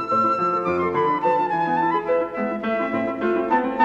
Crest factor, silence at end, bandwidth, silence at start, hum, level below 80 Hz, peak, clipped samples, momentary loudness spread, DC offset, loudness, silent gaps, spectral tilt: 16 dB; 0 s; 7.6 kHz; 0 s; none; -58 dBFS; -6 dBFS; under 0.1%; 4 LU; under 0.1%; -22 LUFS; none; -7.5 dB/octave